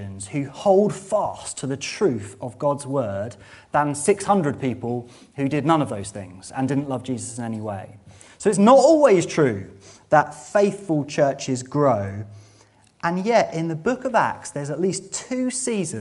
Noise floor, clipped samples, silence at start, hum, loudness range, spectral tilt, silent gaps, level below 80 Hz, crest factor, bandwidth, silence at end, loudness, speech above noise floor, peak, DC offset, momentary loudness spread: -55 dBFS; under 0.1%; 0 s; none; 7 LU; -5.5 dB/octave; none; -60 dBFS; 20 dB; 11.5 kHz; 0 s; -22 LUFS; 33 dB; -2 dBFS; under 0.1%; 13 LU